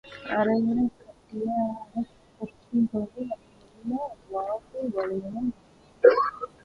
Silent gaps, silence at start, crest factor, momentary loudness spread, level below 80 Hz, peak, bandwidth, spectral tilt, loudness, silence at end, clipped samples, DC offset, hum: none; 0.05 s; 24 dB; 18 LU; -62 dBFS; -4 dBFS; 6 kHz; -8 dB/octave; -27 LUFS; 0.15 s; under 0.1%; under 0.1%; none